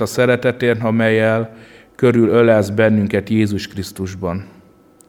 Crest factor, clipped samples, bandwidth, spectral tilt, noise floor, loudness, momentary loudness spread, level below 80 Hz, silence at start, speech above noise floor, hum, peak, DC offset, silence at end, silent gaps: 14 dB; under 0.1%; 16.5 kHz; -6.5 dB/octave; -48 dBFS; -16 LUFS; 13 LU; -52 dBFS; 0 s; 32 dB; none; -2 dBFS; under 0.1%; 0.65 s; none